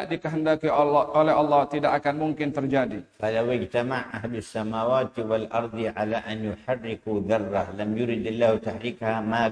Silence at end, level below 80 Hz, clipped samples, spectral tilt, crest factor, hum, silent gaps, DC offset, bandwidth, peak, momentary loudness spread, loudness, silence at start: 0 s; -58 dBFS; under 0.1%; -7 dB/octave; 16 dB; none; none; under 0.1%; 10.5 kHz; -8 dBFS; 9 LU; -26 LUFS; 0 s